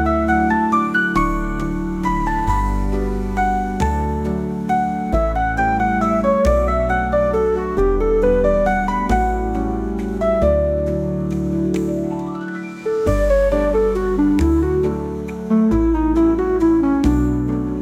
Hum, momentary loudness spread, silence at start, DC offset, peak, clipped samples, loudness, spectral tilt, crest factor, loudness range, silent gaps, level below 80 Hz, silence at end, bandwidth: none; 7 LU; 0 s; under 0.1%; -4 dBFS; under 0.1%; -18 LUFS; -8 dB/octave; 14 dB; 3 LU; none; -26 dBFS; 0 s; 14 kHz